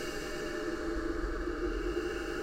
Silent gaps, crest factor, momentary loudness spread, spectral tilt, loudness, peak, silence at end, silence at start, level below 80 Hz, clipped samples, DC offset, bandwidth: none; 14 dB; 2 LU; -5 dB/octave; -36 LUFS; -22 dBFS; 0 s; 0 s; -42 dBFS; under 0.1%; under 0.1%; 16 kHz